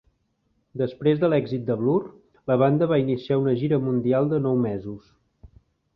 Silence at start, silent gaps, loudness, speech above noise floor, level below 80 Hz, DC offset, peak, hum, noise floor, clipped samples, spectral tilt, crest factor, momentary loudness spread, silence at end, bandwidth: 0.75 s; none; -23 LUFS; 48 dB; -58 dBFS; under 0.1%; -6 dBFS; none; -70 dBFS; under 0.1%; -11 dB/octave; 16 dB; 15 LU; 0.95 s; 5.6 kHz